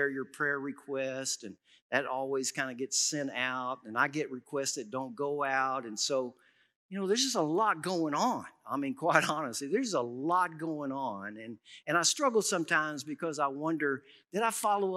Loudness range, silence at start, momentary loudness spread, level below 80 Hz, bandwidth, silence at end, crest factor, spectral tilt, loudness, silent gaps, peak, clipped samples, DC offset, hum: 3 LU; 0 s; 10 LU; under -90 dBFS; 15.5 kHz; 0 s; 26 dB; -2.5 dB/octave; -32 LUFS; 1.82-1.90 s, 6.76-6.89 s; -6 dBFS; under 0.1%; under 0.1%; none